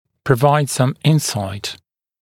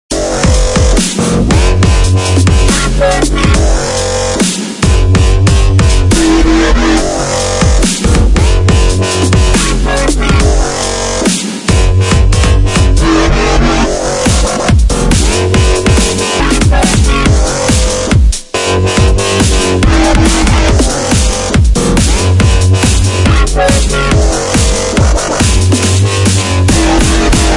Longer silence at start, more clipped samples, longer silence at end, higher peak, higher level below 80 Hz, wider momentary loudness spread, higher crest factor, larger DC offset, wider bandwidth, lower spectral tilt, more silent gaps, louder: first, 0.25 s vs 0.1 s; neither; first, 0.5 s vs 0 s; about the same, 0 dBFS vs 0 dBFS; second, -52 dBFS vs -12 dBFS; first, 13 LU vs 3 LU; first, 18 dB vs 8 dB; neither; first, 16.5 kHz vs 11.5 kHz; about the same, -5.5 dB/octave vs -4.5 dB/octave; neither; second, -17 LUFS vs -10 LUFS